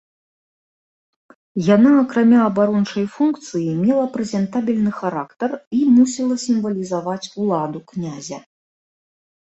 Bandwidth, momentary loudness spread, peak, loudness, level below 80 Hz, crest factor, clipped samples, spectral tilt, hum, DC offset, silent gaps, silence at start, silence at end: 8.2 kHz; 14 LU; -2 dBFS; -18 LUFS; -62 dBFS; 16 dB; under 0.1%; -6.5 dB/octave; none; under 0.1%; 5.67-5.71 s; 1.55 s; 1.15 s